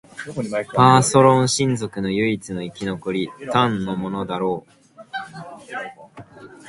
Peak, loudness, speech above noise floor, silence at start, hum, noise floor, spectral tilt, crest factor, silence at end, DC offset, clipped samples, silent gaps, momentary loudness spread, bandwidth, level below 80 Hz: 0 dBFS; -19 LUFS; 22 dB; 0.15 s; none; -42 dBFS; -5 dB/octave; 20 dB; 0 s; under 0.1%; under 0.1%; none; 18 LU; 11.5 kHz; -54 dBFS